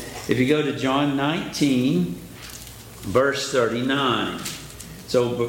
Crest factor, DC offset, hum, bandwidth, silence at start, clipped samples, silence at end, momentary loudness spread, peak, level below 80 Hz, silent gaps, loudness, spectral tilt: 16 dB; under 0.1%; none; 17 kHz; 0 s; under 0.1%; 0 s; 16 LU; -8 dBFS; -50 dBFS; none; -22 LUFS; -5 dB/octave